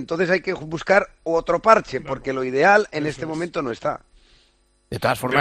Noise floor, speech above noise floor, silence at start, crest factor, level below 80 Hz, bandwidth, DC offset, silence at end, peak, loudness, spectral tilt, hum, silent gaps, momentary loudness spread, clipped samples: -61 dBFS; 40 dB; 0 s; 20 dB; -50 dBFS; 13.5 kHz; under 0.1%; 0 s; 0 dBFS; -21 LUFS; -5.5 dB/octave; none; none; 12 LU; under 0.1%